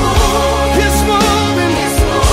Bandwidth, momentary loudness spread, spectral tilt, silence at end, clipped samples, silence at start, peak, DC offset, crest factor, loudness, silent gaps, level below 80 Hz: 16.5 kHz; 2 LU; -4.5 dB/octave; 0 s; under 0.1%; 0 s; 0 dBFS; under 0.1%; 10 dB; -12 LUFS; none; -18 dBFS